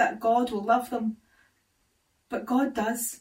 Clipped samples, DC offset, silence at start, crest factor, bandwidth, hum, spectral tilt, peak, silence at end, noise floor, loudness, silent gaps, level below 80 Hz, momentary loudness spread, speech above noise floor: under 0.1%; under 0.1%; 0 s; 18 dB; 16 kHz; none; -4 dB/octave; -10 dBFS; 0.05 s; -71 dBFS; -27 LUFS; none; -66 dBFS; 11 LU; 45 dB